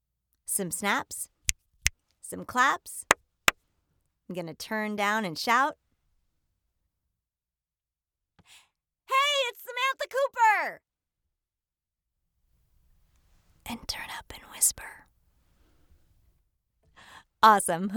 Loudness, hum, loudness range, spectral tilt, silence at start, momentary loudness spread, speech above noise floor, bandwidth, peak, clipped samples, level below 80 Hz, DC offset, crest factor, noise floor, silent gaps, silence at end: -27 LUFS; none; 6 LU; -1.5 dB/octave; 0.5 s; 17 LU; over 63 dB; over 20 kHz; 0 dBFS; under 0.1%; -56 dBFS; under 0.1%; 32 dB; under -90 dBFS; none; 0 s